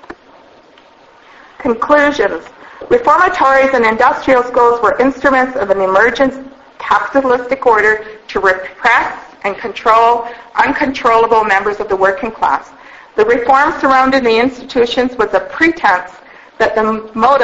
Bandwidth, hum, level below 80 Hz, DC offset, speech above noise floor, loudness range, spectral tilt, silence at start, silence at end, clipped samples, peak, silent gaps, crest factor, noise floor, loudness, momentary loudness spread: 8 kHz; none; -44 dBFS; under 0.1%; 32 dB; 3 LU; -4.5 dB/octave; 0.1 s; 0 s; 0.1%; 0 dBFS; none; 12 dB; -43 dBFS; -12 LUFS; 9 LU